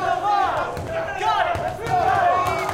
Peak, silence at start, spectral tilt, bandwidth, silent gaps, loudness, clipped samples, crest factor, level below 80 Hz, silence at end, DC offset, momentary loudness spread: -8 dBFS; 0 s; -4.5 dB/octave; 16.5 kHz; none; -21 LUFS; under 0.1%; 14 dB; -46 dBFS; 0 s; under 0.1%; 8 LU